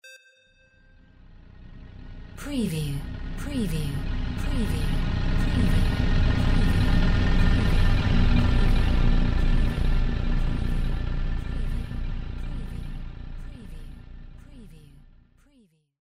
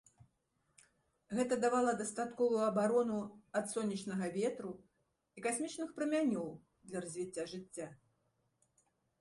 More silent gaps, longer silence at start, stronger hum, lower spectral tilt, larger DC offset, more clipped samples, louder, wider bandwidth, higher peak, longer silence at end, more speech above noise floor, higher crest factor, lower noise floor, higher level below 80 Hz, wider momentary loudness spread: neither; second, 0 s vs 1.3 s; neither; first, -6.5 dB/octave vs -5 dB/octave; first, 0.4% vs under 0.1%; neither; first, -27 LUFS vs -37 LUFS; about the same, 11.5 kHz vs 11.5 kHz; first, -10 dBFS vs -20 dBFS; second, 0.05 s vs 1.25 s; second, 37 dB vs 44 dB; about the same, 14 dB vs 18 dB; second, -61 dBFS vs -81 dBFS; first, -26 dBFS vs -78 dBFS; first, 21 LU vs 14 LU